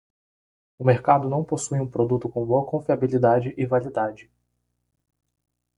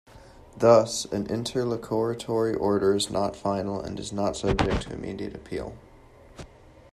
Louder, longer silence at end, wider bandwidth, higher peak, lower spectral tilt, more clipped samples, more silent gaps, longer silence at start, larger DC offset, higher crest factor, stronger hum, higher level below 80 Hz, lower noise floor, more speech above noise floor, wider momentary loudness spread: first, -23 LUFS vs -26 LUFS; first, 1.55 s vs 0.45 s; second, 11.5 kHz vs 13.5 kHz; about the same, -2 dBFS vs -4 dBFS; first, -7.5 dB/octave vs -5 dB/octave; neither; neither; first, 0.8 s vs 0.15 s; neither; about the same, 22 dB vs 22 dB; first, 60 Hz at -45 dBFS vs none; second, -60 dBFS vs -44 dBFS; first, -75 dBFS vs -51 dBFS; first, 52 dB vs 26 dB; second, 7 LU vs 15 LU